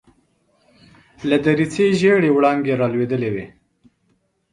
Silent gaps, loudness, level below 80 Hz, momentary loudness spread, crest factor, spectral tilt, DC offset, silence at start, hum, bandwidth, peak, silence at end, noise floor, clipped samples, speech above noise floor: none; -18 LUFS; -56 dBFS; 12 LU; 18 dB; -6.5 dB/octave; under 0.1%; 1.2 s; none; 10.5 kHz; -2 dBFS; 1.05 s; -65 dBFS; under 0.1%; 48 dB